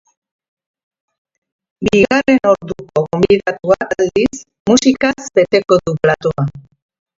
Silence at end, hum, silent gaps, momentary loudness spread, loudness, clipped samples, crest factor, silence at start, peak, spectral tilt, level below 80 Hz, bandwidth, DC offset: 0.6 s; none; 4.60-4.65 s; 8 LU; -14 LUFS; under 0.1%; 16 dB; 1.8 s; 0 dBFS; -5.5 dB/octave; -46 dBFS; 7.8 kHz; under 0.1%